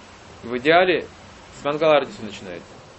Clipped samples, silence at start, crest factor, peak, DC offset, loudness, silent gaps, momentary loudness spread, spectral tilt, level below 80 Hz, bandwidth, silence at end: under 0.1%; 0.3 s; 20 dB; -2 dBFS; under 0.1%; -20 LUFS; none; 21 LU; -5 dB/octave; -54 dBFS; 8.4 kHz; 0.2 s